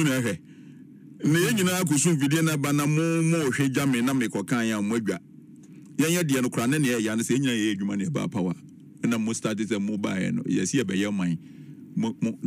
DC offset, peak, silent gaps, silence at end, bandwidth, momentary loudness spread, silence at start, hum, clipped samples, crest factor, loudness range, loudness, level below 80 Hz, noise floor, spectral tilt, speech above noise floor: under 0.1%; -10 dBFS; none; 0 s; 16 kHz; 8 LU; 0 s; none; under 0.1%; 16 dB; 4 LU; -25 LUFS; -68 dBFS; -47 dBFS; -5 dB/octave; 23 dB